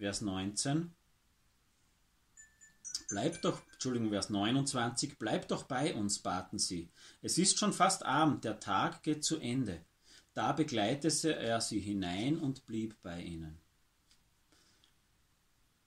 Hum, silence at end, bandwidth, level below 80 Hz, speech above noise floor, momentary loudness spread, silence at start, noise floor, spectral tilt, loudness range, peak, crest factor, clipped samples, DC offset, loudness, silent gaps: none; 2.3 s; 14.5 kHz; -66 dBFS; 38 dB; 14 LU; 0 s; -73 dBFS; -4 dB/octave; 8 LU; -16 dBFS; 20 dB; under 0.1%; under 0.1%; -35 LUFS; none